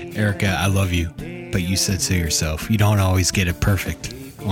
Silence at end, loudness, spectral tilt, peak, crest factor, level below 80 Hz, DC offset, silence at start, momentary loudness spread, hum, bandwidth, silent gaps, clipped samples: 0 s; -20 LUFS; -4.5 dB/octave; -4 dBFS; 16 dB; -34 dBFS; under 0.1%; 0 s; 11 LU; none; 17 kHz; none; under 0.1%